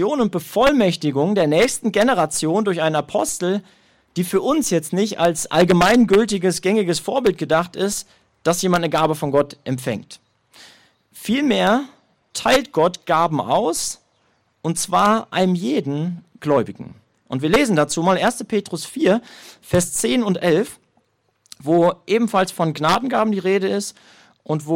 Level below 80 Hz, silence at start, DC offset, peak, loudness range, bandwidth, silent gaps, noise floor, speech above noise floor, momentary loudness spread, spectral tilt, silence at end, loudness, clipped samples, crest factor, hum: -50 dBFS; 0 s; under 0.1%; -6 dBFS; 4 LU; 16.5 kHz; none; -64 dBFS; 46 dB; 10 LU; -4.5 dB/octave; 0 s; -19 LUFS; under 0.1%; 14 dB; none